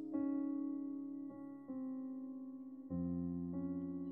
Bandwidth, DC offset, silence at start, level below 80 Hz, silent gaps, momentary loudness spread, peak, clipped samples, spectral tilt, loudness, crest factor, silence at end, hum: 2.1 kHz; under 0.1%; 0 s; -76 dBFS; none; 10 LU; -30 dBFS; under 0.1%; -12.5 dB/octave; -44 LUFS; 14 dB; 0 s; none